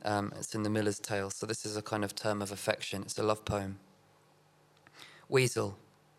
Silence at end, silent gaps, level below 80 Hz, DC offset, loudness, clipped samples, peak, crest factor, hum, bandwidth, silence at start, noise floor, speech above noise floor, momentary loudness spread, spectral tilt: 0.4 s; none; -66 dBFS; under 0.1%; -34 LUFS; under 0.1%; -10 dBFS; 24 dB; none; 16 kHz; 0 s; -65 dBFS; 32 dB; 15 LU; -4.5 dB/octave